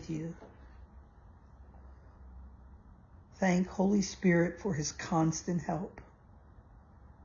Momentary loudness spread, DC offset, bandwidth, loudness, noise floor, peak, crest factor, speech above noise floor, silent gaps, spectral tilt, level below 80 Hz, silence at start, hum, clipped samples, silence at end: 26 LU; under 0.1%; 7.4 kHz; -32 LUFS; -57 dBFS; -16 dBFS; 18 dB; 26 dB; none; -6 dB/octave; -56 dBFS; 0 s; none; under 0.1%; 0.2 s